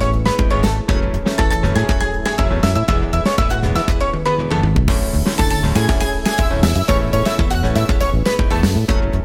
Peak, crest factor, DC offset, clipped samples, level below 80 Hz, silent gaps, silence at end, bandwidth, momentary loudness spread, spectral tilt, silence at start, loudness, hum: 0 dBFS; 14 dB; under 0.1%; under 0.1%; -18 dBFS; none; 0 s; 16.5 kHz; 2 LU; -6 dB/octave; 0 s; -17 LUFS; none